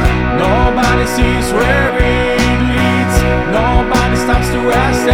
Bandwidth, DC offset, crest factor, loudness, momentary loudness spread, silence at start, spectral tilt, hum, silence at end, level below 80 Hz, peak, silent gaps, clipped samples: 16.5 kHz; under 0.1%; 12 dB; -12 LUFS; 2 LU; 0 s; -5.5 dB/octave; none; 0 s; -18 dBFS; 0 dBFS; none; under 0.1%